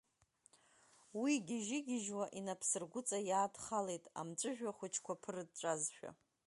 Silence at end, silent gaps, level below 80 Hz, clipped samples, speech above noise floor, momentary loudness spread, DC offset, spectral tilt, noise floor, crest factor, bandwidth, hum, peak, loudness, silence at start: 0.35 s; none; -86 dBFS; under 0.1%; 33 dB; 8 LU; under 0.1%; -3.5 dB/octave; -75 dBFS; 20 dB; 11.5 kHz; none; -24 dBFS; -41 LUFS; 1.15 s